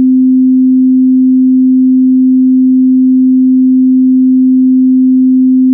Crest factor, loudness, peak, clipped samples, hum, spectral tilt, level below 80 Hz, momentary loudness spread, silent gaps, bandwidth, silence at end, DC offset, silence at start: 4 dB; -7 LUFS; -2 dBFS; under 0.1%; none; -17.5 dB/octave; -70 dBFS; 0 LU; none; 0.4 kHz; 0 s; under 0.1%; 0 s